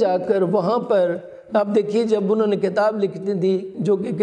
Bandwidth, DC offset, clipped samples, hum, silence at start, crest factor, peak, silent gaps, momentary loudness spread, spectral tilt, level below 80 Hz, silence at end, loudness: 9.8 kHz; under 0.1%; under 0.1%; none; 0 s; 14 dB; -6 dBFS; none; 4 LU; -7.5 dB/octave; -68 dBFS; 0 s; -20 LUFS